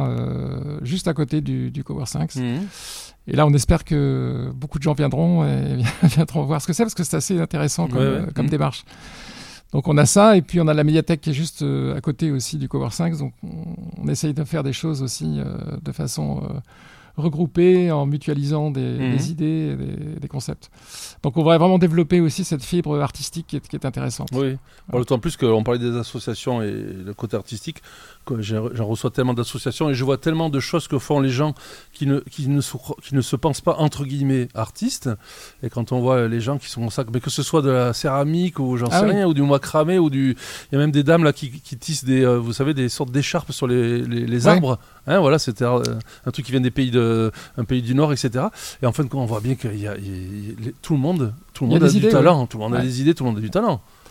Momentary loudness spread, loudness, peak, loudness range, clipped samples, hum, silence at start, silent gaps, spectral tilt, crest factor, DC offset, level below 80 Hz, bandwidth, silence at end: 14 LU; -21 LUFS; 0 dBFS; 6 LU; under 0.1%; none; 0 s; none; -6 dB/octave; 20 dB; under 0.1%; -44 dBFS; 16 kHz; 0.3 s